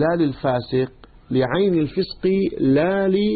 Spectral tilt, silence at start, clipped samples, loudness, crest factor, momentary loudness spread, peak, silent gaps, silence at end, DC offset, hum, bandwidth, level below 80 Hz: -12 dB/octave; 0 s; under 0.1%; -20 LUFS; 12 dB; 6 LU; -8 dBFS; none; 0 s; under 0.1%; none; 4.8 kHz; -46 dBFS